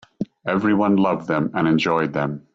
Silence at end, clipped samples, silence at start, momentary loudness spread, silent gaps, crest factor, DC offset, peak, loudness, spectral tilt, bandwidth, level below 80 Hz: 0.15 s; under 0.1%; 0.2 s; 8 LU; none; 14 dB; under 0.1%; -6 dBFS; -20 LUFS; -7.5 dB/octave; 7.6 kHz; -58 dBFS